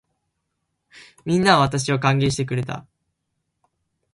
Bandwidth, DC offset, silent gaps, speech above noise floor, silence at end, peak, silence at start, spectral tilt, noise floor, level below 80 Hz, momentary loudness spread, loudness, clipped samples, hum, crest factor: 11.5 kHz; under 0.1%; none; 57 dB; 1.35 s; 0 dBFS; 0.95 s; -5 dB/octave; -76 dBFS; -52 dBFS; 16 LU; -20 LUFS; under 0.1%; none; 22 dB